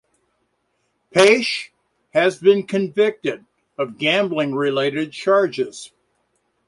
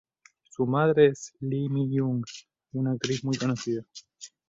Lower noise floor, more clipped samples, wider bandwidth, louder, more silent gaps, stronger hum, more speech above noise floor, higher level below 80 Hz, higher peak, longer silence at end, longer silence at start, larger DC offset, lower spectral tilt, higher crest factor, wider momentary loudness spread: first, -70 dBFS vs -58 dBFS; neither; first, 11.5 kHz vs 7.8 kHz; first, -19 LUFS vs -27 LUFS; neither; neither; first, 51 dB vs 32 dB; about the same, -66 dBFS vs -66 dBFS; first, -2 dBFS vs -8 dBFS; first, 0.8 s vs 0.25 s; first, 1.15 s vs 0.6 s; neither; second, -4.5 dB/octave vs -6.5 dB/octave; about the same, 18 dB vs 20 dB; second, 14 LU vs 22 LU